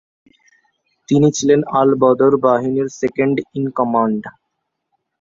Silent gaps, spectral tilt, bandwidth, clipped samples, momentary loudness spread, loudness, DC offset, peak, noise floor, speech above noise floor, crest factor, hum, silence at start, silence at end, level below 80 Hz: none; -6.5 dB/octave; 7.8 kHz; under 0.1%; 8 LU; -16 LUFS; under 0.1%; -2 dBFS; -75 dBFS; 59 dB; 16 dB; none; 1.1 s; 0.9 s; -58 dBFS